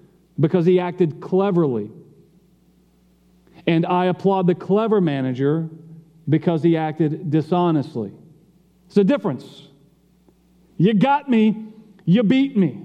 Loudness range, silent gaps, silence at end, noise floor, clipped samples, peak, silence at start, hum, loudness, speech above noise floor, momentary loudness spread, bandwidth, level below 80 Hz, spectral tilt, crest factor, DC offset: 3 LU; none; 0 s; -57 dBFS; under 0.1%; -2 dBFS; 0.4 s; none; -20 LUFS; 38 dB; 12 LU; 6.6 kHz; -68 dBFS; -9 dB/octave; 18 dB; under 0.1%